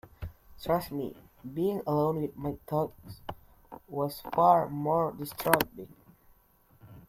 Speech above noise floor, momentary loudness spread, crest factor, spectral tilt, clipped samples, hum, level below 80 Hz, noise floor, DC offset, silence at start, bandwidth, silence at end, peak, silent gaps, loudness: 34 dB; 21 LU; 26 dB; -6 dB/octave; under 0.1%; none; -58 dBFS; -63 dBFS; under 0.1%; 0.05 s; 16.5 kHz; 0.1 s; -4 dBFS; none; -30 LUFS